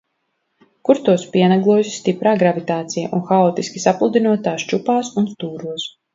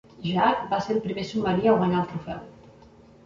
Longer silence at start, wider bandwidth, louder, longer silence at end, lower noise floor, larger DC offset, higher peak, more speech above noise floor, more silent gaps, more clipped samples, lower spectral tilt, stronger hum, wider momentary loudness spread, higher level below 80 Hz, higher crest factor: first, 0.85 s vs 0.2 s; about the same, 7.8 kHz vs 7.6 kHz; first, -18 LUFS vs -25 LUFS; second, 0.25 s vs 0.75 s; first, -71 dBFS vs -51 dBFS; neither; first, 0 dBFS vs -6 dBFS; first, 54 dB vs 27 dB; neither; neither; about the same, -6 dB/octave vs -7 dB/octave; neither; second, 9 LU vs 13 LU; second, -64 dBFS vs -56 dBFS; about the same, 18 dB vs 18 dB